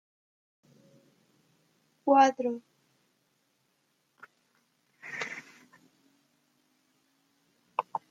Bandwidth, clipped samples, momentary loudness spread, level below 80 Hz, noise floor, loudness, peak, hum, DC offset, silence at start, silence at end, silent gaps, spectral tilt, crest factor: 7.8 kHz; under 0.1%; 20 LU; under -90 dBFS; -75 dBFS; -29 LUFS; -10 dBFS; none; under 0.1%; 2.05 s; 0.1 s; none; -3.5 dB/octave; 26 dB